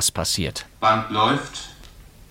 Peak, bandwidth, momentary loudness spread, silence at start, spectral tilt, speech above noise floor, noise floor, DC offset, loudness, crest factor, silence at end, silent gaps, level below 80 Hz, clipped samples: -4 dBFS; 16.5 kHz; 15 LU; 0 s; -3 dB/octave; 22 dB; -45 dBFS; under 0.1%; -21 LUFS; 18 dB; 0.25 s; none; -46 dBFS; under 0.1%